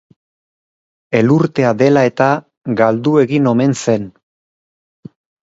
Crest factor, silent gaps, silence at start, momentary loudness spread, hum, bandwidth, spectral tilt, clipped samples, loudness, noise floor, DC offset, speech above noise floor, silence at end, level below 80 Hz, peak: 16 dB; 2.57-2.61 s; 1.1 s; 8 LU; none; 8 kHz; -7 dB/octave; under 0.1%; -14 LUFS; under -90 dBFS; under 0.1%; over 77 dB; 1.35 s; -58 dBFS; 0 dBFS